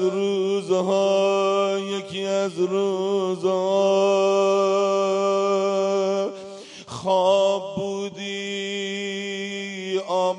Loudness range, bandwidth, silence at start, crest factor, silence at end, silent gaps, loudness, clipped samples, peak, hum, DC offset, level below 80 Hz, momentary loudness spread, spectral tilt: 4 LU; 11 kHz; 0 s; 14 dB; 0 s; none; -22 LUFS; under 0.1%; -8 dBFS; none; under 0.1%; -72 dBFS; 10 LU; -4.5 dB/octave